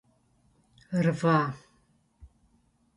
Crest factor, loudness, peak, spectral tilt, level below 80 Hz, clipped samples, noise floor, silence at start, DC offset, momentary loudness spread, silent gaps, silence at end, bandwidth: 20 dB; -27 LUFS; -10 dBFS; -7.5 dB/octave; -62 dBFS; under 0.1%; -67 dBFS; 0.9 s; under 0.1%; 11 LU; none; 0.7 s; 11.5 kHz